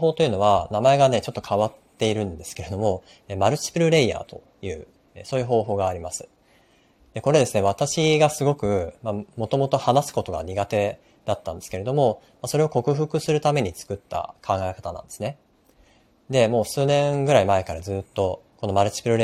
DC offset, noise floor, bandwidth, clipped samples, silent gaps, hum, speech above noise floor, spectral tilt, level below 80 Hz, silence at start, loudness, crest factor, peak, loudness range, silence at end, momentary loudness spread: under 0.1%; -58 dBFS; 15.5 kHz; under 0.1%; none; none; 36 dB; -5.5 dB/octave; -52 dBFS; 0 s; -23 LUFS; 20 dB; -4 dBFS; 4 LU; 0 s; 14 LU